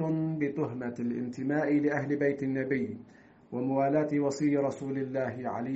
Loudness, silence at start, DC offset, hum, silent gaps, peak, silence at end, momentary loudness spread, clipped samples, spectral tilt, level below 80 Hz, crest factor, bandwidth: -31 LUFS; 0 s; under 0.1%; none; none; -14 dBFS; 0 s; 7 LU; under 0.1%; -8 dB/octave; -70 dBFS; 16 dB; 8 kHz